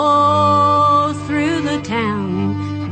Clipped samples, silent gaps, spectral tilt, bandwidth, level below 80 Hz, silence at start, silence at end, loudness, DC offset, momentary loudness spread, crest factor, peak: under 0.1%; none; -6.5 dB/octave; 9 kHz; -48 dBFS; 0 s; 0 s; -16 LUFS; under 0.1%; 8 LU; 12 dB; -2 dBFS